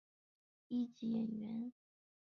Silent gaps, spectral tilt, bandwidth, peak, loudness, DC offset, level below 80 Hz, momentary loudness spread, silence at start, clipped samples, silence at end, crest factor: none; -8.5 dB/octave; 6.2 kHz; -30 dBFS; -43 LUFS; under 0.1%; -86 dBFS; 6 LU; 0.7 s; under 0.1%; 0.65 s; 14 dB